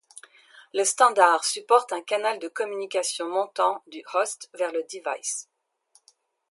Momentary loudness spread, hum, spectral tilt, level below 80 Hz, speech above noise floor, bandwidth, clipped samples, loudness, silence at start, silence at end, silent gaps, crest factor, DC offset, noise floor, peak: 11 LU; none; 0 dB/octave; under -90 dBFS; 40 dB; 12 kHz; under 0.1%; -25 LUFS; 0.55 s; 1.1 s; none; 24 dB; under 0.1%; -64 dBFS; -2 dBFS